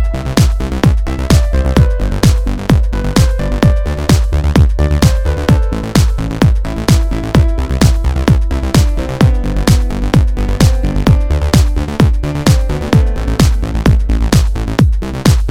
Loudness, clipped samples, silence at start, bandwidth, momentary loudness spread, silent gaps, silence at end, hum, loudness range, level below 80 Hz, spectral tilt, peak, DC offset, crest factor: -13 LUFS; 0.1%; 0 s; 16 kHz; 3 LU; none; 0 s; none; 1 LU; -14 dBFS; -6 dB/octave; 0 dBFS; under 0.1%; 10 dB